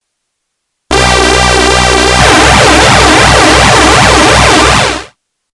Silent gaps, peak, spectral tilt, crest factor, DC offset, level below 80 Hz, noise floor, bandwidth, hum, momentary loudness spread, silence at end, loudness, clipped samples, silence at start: none; 0 dBFS; -3 dB/octave; 6 dB; under 0.1%; -18 dBFS; -68 dBFS; 12 kHz; none; 5 LU; 0.45 s; -4 LUFS; 5%; 0.9 s